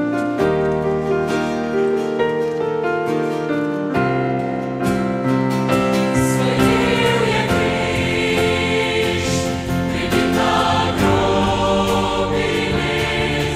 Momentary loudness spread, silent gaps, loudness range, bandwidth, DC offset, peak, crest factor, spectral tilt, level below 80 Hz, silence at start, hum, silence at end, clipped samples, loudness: 5 LU; none; 3 LU; 16 kHz; under 0.1%; -2 dBFS; 16 dB; -5.5 dB/octave; -36 dBFS; 0 s; none; 0 s; under 0.1%; -18 LUFS